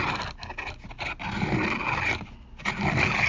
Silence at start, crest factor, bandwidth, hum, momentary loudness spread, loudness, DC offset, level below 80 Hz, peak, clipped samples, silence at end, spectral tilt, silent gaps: 0 s; 18 dB; 7.6 kHz; none; 11 LU; -28 LUFS; under 0.1%; -42 dBFS; -10 dBFS; under 0.1%; 0 s; -5 dB/octave; none